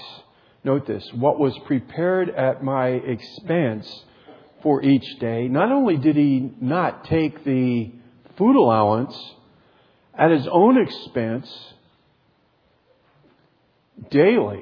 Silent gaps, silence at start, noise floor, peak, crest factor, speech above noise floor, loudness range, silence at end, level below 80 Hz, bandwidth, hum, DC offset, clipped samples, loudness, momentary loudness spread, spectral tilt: none; 0 s; -62 dBFS; -2 dBFS; 20 dB; 43 dB; 4 LU; 0 s; -60 dBFS; 5.4 kHz; none; under 0.1%; under 0.1%; -20 LUFS; 14 LU; -9.5 dB/octave